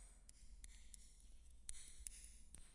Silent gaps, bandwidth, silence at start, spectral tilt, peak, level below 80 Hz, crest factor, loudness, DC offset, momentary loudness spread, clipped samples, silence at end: none; 11.5 kHz; 0 s; -1.5 dB/octave; -30 dBFS; -62 dBFS; 28 dB; -59 LUFS; under 0.1%; 11 LU; under 0.1%; 0 s